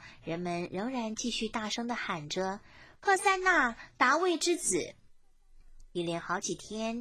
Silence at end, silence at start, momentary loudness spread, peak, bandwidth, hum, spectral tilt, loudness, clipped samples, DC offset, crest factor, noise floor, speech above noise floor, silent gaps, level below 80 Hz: 0 s; 0 s; 11 LU; -10 dBFS; 16 kHz; none; -3 dB/octave; -31 LUFS; under 0.1%; under 0.1%; 22 dB; -58 dBFS; 27 dB; none; -60 dBFS